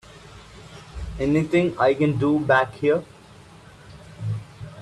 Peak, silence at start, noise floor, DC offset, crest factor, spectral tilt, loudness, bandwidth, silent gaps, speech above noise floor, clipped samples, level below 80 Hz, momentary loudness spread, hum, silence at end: -6 dBFS; 0.15 s; -47 dBFS; under 0.1%; 18 dB; -7.5 dB/octave; -22 LUFS; 11.5 kHz; none; 27 dB; under 0.1%; -44 dBFS; 23 LU; none; 0 s